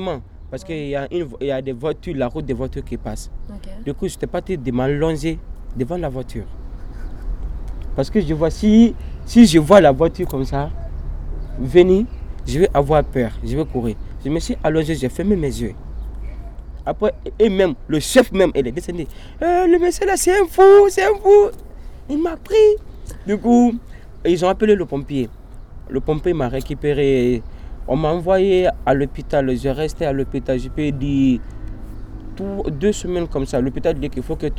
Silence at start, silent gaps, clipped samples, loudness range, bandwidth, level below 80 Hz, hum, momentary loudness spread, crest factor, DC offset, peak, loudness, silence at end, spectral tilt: 0 s; none; under 0.1%; 10 LU; 16 kHz; -30 dBFS; none; 20 LU; 18 dB; under 0.1%; 0 dBFS; -18 LUFS; 0 s; -6 dB/octave